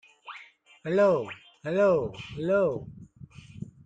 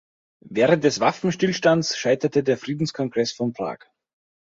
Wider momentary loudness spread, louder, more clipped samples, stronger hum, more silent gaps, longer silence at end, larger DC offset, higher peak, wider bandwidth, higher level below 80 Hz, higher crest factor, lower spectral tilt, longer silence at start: first, 21 LU vs 10 LU; second, -26 LUFS vs -22 LUFS; neither; neither; neither; second, 0.15 s vs 0.65 s; neither; second, -12 dBFS vs -4 dBFS; first, 8.8 kHz vs 7.8 kHz; about the same, -60 dBFS vs -62 dBFS; about the same, 18 dB vs 20 dB; first, -7.5 dB/octave vs -5 dB/octave; second, 0.25 s vs 0.45 s